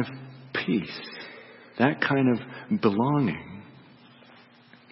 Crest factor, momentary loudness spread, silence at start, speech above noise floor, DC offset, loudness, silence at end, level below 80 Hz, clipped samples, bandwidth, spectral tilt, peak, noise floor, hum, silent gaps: 22 dB; 20 LU; 0 s; 29 dB; under 0.1%; -26 LUFS; 1.3 s; -66 dBFS; under 0.1%; 5.8 kHz; -10.5 dB/octave; -6 dBFS; -54 dBFS; none; none